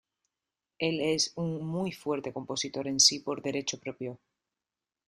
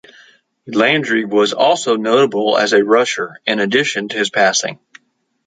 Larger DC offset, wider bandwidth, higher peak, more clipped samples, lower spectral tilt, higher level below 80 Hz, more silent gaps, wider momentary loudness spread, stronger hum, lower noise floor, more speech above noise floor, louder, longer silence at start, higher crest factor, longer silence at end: neither; first, 13.5 kHz vs 9.4 kHz; second, -8 dBFS vs 0 dBFS; neither; about the same, -2.5 dB/octave vs -3 dB/octave; second, -72 dBFS vs -66 dBFS; neither; first, 14 LU vs 6 LU; neither; first, under -90 dBFS vs -60 dBFS; first, over 59 dB vs 45 dB; second, -29 LUFS vs -15 LUFS; first, 0.8 s vs 0.65 s; first, 24 dB vs 16 dB; first, 0.9 s vs 0.7 s